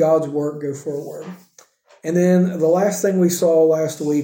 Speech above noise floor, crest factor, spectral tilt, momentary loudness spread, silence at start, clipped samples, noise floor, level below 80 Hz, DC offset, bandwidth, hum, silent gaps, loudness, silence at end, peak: 34 dB; 14 dB; -6.5 dB/octave; 15 LU; 0 s; under 0.1%; -51 dBFS; -70 dBFS; under 0.1%; 17 kHz; none; none; -18 LUFS; 0 s; -4 dBFS